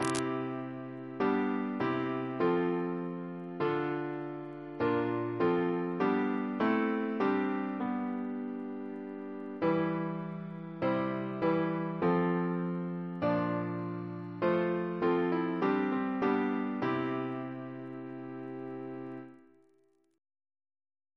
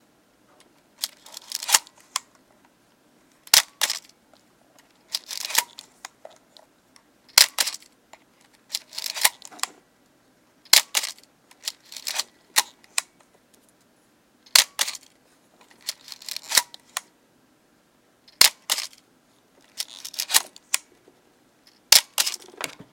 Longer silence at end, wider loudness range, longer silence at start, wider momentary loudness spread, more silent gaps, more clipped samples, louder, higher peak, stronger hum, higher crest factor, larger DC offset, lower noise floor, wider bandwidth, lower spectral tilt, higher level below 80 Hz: first, 1.8 s vs 0.2 s; about the same, 5 LU vs 6 LU; second, 0 s vs 1 s; second, 12 LU vs 18 LU; neither; neither; second, -33 LUFS vs -22 LUFS; second, -12 dBFS vs 0 dBFS; neither; second, 20 dB vs 28 dB; neither; first, -70 dBFS vs -62 dBFS; second, 11 kHz vs 17 kHz; first, -7 dB/octave vs 3 dB/octave; about the same, -72 dBFS vs -70 dBFS